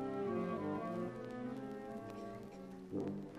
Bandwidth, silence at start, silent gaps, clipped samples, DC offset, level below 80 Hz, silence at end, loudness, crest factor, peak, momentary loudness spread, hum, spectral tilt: 14 kHz; 0 s; none; under 0.1%; under 0.1%; -70 dBFS; 0 s; -44 LUFS; 14 dB; -28 dBFS; 10 LU; none; -8 dB/octave